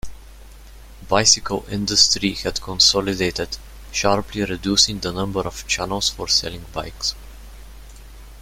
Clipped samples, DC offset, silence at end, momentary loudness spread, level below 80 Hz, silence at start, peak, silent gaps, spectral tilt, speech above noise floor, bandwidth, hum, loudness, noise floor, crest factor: under 0.1%; under 0.1%; 0 s; 13 LU; -40 dBFS; 0.05 s; 0 dBFS; none; -2 dB/octave; 21 dB; 16.5 kHz; none; -19 LUFS; -41 dBFS; 22 dB